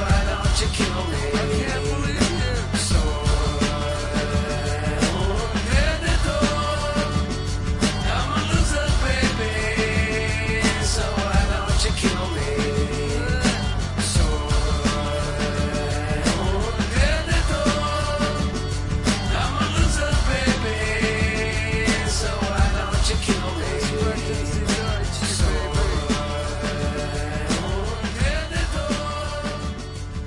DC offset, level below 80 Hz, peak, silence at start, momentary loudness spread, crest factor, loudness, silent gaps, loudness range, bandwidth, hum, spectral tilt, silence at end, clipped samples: under 0.1%; -26 dBFS; -6 dBFS; 0 s; 4 LU; 16 dB; -23 LUFS; none; 2 LU; 11.5 kHz; none; -4.5 dB/octave; 0 s; under 0.1%